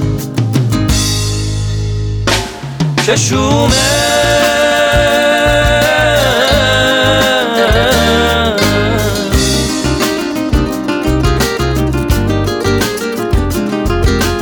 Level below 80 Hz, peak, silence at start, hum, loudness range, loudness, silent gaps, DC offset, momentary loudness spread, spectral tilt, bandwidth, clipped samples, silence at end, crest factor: -22 dBFS; 0 dBFS; 0 s; none; 4 LU; -12 LUFS; none; under 0.1%; 6 LU; -4.5 dB/octave; over 20 kHz; under 0.1%; 0 s; 12 dB